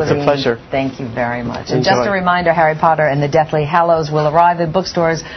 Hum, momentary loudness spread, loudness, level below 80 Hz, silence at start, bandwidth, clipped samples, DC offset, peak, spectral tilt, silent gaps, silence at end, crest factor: none; 7 LU; -15 LUFS; -44 dBFS; 0 s; 6.4 kHz; under 0.1%; under 0.1%; 0 dBFS; -6 dB/octave; none; 0 s; 14 dB